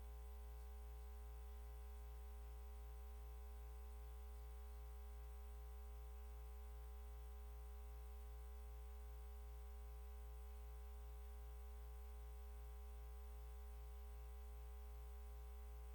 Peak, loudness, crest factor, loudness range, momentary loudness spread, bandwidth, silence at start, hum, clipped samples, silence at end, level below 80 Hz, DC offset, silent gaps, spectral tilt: -46 dBFS; -57 LUFS; 8 dB; 0 LU; 0 LU; 19 kHz; 0 s; 60 Hz at -55 dBFS; under 0.1%; 0 s; -54 dBFS; under 0.1%; none; -6 dB/octave